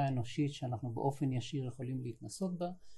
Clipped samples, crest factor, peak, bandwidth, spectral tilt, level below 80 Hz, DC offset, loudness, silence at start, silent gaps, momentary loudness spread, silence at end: under 0.1%; 16 dB; -22 dBFS; 12 kHz; -7 dB/octave; -68 dBFS; under 0.1%; -38 LUFS; 0 s; none; 6 LU; 0 s